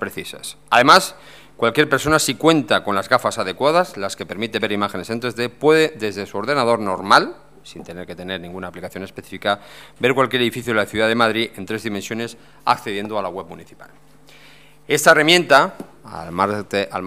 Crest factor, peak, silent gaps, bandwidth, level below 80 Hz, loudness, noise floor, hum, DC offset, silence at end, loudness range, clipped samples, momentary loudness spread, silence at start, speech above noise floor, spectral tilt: 20 dB; 0 dBFS; none; 16 kHz; -54 dBFS; -18 LUFS; -48 dBFS; none; 0.4%; 0 s; 6 LU; under 0.1%; 18 LU; 0 s; 29 dB; -3.5 dB/octave